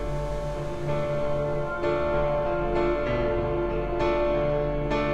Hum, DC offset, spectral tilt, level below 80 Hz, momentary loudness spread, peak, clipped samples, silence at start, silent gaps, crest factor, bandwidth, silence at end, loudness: none; under 0.1%; -7.5 dB/octave; -36 dBFS; 6 LU; -12 dBFS; under 0.1%; 0 s; none; 14 dB; 10 kHz; 0 s; -27 LUFS